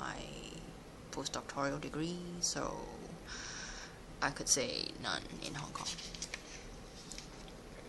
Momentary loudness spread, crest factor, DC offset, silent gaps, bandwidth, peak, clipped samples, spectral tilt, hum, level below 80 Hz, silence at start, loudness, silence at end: 16 LU; 26 dB; under 0.1%; none; 12.5 kHz; -16 dBFS; under 0.1%; -2.5 dB/octave; none; -56 dBFS; 0 s; -40 LUFS; 0 s